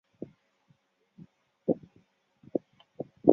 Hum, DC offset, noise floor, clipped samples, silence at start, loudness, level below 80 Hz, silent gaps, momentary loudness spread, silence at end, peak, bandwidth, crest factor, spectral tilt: none; under 0.1%; -69 dBFS; under 0.1%; 1.7 s; -34 LUFS; -74 dBFS; none; 24 LU; 0 s; -2 dBFS; 6 kHz; 32 dB; -10.5 dB/octave